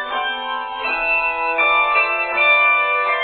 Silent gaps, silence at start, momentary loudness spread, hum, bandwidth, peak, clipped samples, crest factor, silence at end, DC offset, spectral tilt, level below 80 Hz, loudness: none; 0 s; 10 LU; none; 4.7 kHz; -4 dBFS; under 0.1%; 14 dB; 0 s; under 0.1%; -4 dB/octave; -50 dBFS; -16 LUFS